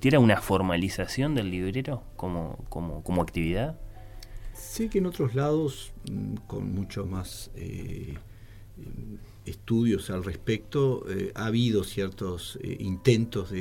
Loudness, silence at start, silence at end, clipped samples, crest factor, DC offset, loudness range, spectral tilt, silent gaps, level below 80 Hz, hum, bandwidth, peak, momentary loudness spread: -29 LUFS; 0 s; 0 s; under 0.1%; 22 dB; under 0.1%; 8 LU; -6.5 dB/octave; none; -44 dBFS; none; 17.5 kHz; -8 dBFS; 17 LU